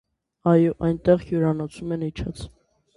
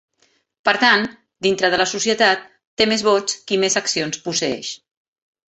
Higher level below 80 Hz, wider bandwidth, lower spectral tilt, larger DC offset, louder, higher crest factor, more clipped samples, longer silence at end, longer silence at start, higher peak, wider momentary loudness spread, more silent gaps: first, -46 dBFS vs -60 dBFS; first, 11.5 kHz vs 8.4 kHz; first, -8.5 dB/octave vs -2 dB/octave; neither; second, -23 LUFS vs -18 LUFS; about the same, 18 dB vs 18 dB; neither; second, 0.5 s vs 0.7 s; second, 0.45 s vs 0.65 s; about the same, -4 dBFS vs -2 dBFS; first, 14 LU vs 11 LU; second, none vs 2.67-2.77 s